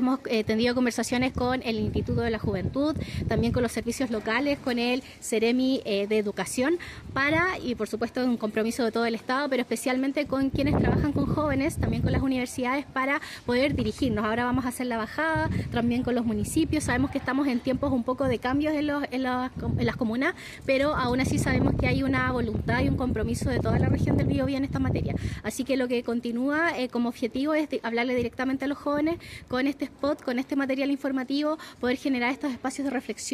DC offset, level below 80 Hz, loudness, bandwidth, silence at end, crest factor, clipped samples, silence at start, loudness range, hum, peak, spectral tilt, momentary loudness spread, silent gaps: under 0.1%; -42 dBFS; -27 LUFS; 14.5 kHz; 0 s; 16 dB; under 0.1%; 0 s; 2 LU; none; -10 dBFS; -6 dB/octave; 5 LU; none